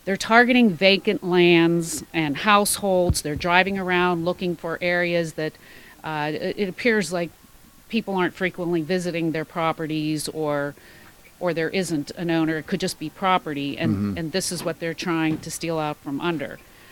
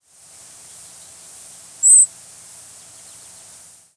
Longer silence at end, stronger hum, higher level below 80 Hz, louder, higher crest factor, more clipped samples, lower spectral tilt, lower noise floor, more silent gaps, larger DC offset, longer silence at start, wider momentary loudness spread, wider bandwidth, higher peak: second, 0.35 s vs 1.9 s; neither; first, -48 dBFS vs -72 dBFS; second, -22 LUFS vs -11 LUFS; about the same, 22 dB vs 20 dB; neither; first, -4.5 dB/octave vs 2.5 dB/octave; first, -50 dBFS vs -45 dBFS; neither; neither; second, 0.05 s vs 1.85 s; second, 11 LU vs 29 LU; first, 18 kHz vs 11 kHz; about the same, 0 dBFS vs -2 dBFS